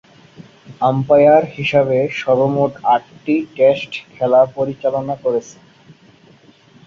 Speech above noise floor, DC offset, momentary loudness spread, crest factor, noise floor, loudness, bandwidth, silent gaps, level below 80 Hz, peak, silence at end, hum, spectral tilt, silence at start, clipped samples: 33 dB; under 0.1%; 9 LU; 16 dB; -48 dBFS; -16 LUFS; 7.2 kHz; none; -56 dBFS; -2 dBFS; 1.35 s; none; -7 dB/octave; 0.4 s; under 0.1%